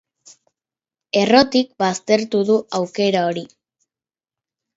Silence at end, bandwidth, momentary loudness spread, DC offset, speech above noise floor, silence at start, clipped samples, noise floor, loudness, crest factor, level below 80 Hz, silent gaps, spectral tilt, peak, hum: 1.3 s; 8 kHz; 9 LU; under 0.1%; over 73 dB; 1.15 s; under 0.1%; under -90 dBFS; -18 LUFS; 20 dB; -62 dBFS; none; -4.5 dB/octave; 0 dBFS; none